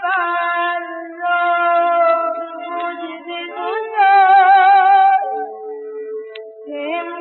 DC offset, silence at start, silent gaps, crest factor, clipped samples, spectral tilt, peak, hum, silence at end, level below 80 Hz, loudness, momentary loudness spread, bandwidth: under 0.1%; 0 s; none; 14 dB; under 0.1%; 3.5 dB/octave; -2 dBFS; none; 0 s; under -90 dBFS; -15 LUFS; 19 LU; 4.3 kHz